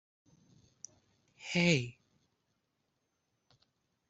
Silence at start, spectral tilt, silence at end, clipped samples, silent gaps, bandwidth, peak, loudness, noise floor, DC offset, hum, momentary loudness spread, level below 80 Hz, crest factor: 1.4 s; -4.5 dB/octave; 2.2 s; under 0.1%; none; 8 kHz; -14 dBFS; -31 LUFS; -82 dBFS; under 0.1%; none; 24 LU; -76 dBFS; 26 dB